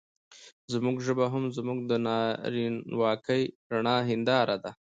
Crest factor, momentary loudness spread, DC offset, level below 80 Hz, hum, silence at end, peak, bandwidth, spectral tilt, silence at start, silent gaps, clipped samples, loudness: 18 dB; 5 LU; under 0.1%; -72 dBFS; none; 0.1 s; -12 dBFS; 8.8 kHz; -6 dB/octave; 0.3 s; 0.52-0.68 s, 3.55-3.70 s; under 0.1%; -29 LUFS